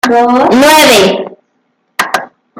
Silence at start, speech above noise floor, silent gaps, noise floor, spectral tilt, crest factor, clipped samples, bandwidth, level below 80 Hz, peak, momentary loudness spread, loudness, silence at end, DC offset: 0.05 s; 54 dB; none; -60 dBFS; -3 dB/octave; 8 dB; 0.2%; 17 kHz; -48 dBFS; 0 dBFS; 15 LU; -7 LUFS; 0.35 s; under 0.1%